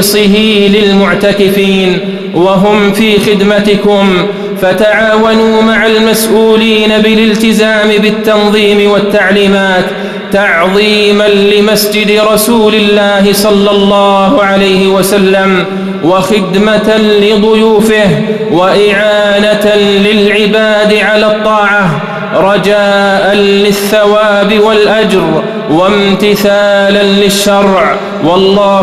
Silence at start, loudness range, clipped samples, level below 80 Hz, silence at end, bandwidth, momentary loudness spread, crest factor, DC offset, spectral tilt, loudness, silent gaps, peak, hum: 0 s; 1 LU; 1%; -36 dBFS; 0 s; 14.5 kHz; 3 LU; 6 dB; 0.2%; -4.5 dB/octave; -7 LUFS; none; 0 dBFS; none